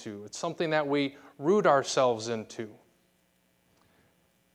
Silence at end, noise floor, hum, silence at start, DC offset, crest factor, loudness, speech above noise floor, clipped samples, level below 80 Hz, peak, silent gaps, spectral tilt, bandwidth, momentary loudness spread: 1.85 s; -70 dBFS; none; 0 s; under 0.1%; 22 dB; -28 LUFS; 41 dB; under 0.1%; -78 dBFS; -10 dBFS; none; -4.5 dB/octave; 12.5 kHz; 17 LU